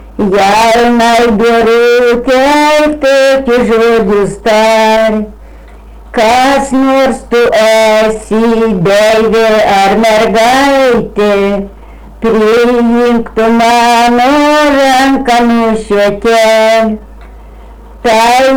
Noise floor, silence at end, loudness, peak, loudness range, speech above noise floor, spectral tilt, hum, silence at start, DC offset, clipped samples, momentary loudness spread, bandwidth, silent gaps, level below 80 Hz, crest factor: -31 dBFS; 0 s; -7 LUFS; -4 dBFS; 2 LU; 24 dB; -4.5 dB/octave; none; 0 s; under 0.1%; under 0.1%; 4 LU; over 20 kHz; none; -32 dBFS; 4 dB